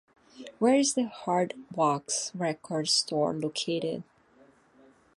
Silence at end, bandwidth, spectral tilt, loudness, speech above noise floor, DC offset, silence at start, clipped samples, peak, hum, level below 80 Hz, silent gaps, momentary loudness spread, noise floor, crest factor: 1.15 s; 11.5 kHz; -3.5 dB/octave; -28 LUFS; 32 dB; under 0.1%; 0.35 s; under 0.1%; -12 dBFS; none; -76 dBFS; none; 9 LU; -60 dBFS; 18 dB